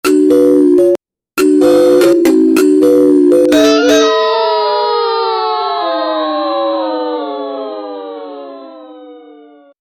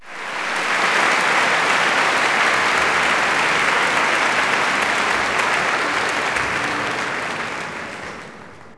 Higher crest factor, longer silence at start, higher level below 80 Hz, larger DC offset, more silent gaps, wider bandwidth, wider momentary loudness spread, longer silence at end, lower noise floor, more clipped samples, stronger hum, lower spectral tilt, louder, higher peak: about the same, 12 dB vs 16 dB; about the same, 0.05 s vs 0 s; about the same, -54 dBFS vs -54 dBFS; neither; neither; first, 16 kHz vs 11 kHz; first, 15 LU vs 11 LU; first, 0.8 s vs 0.05 s; about the same, -39 dBFS vs -39 dBFS; neither; neither; first, -4 dB/octave vs -1.5 dB/octave; first, -11 LUFS vs -17 LUFS; first, 0 dBFS vs -4 dBFS